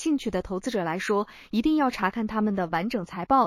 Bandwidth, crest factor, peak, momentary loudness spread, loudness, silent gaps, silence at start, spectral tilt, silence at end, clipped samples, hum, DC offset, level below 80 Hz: 15 kHz; 16 dB; -10 dBFS; 6 LU; -27 LUFS; none; 0 s; -6 dB/octave; 0 s; under 0.1%; none; under 0.1%; -52 dBFS